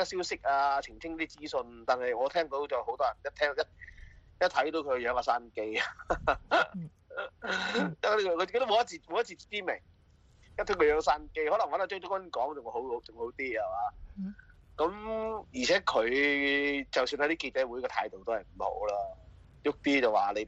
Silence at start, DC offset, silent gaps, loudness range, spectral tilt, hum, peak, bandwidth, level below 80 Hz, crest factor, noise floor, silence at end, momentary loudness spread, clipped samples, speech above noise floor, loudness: 0 s; under 0.1%; none; 4 LU; -4 dB/octave; none; -12 dBFS; 8.4 kHz; -56 dBFS; 20 dB; -62 dBFS; 0 s; 11 LU; under 0.1%; 30 dB; -31 LUFS